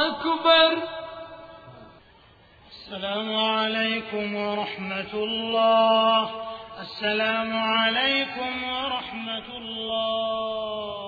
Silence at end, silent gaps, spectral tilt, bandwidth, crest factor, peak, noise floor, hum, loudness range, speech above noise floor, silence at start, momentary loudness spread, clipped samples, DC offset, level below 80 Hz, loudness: 0 s; none; -5.5 dB/octave; 4.9 kHz; 20 dB; -6 dBFS; -54 dBFS; none; 5 LU; 30 dB; 0 s; 17 LU; under 0.1%; under 0.1%; -60 dBFS; -24 LUFS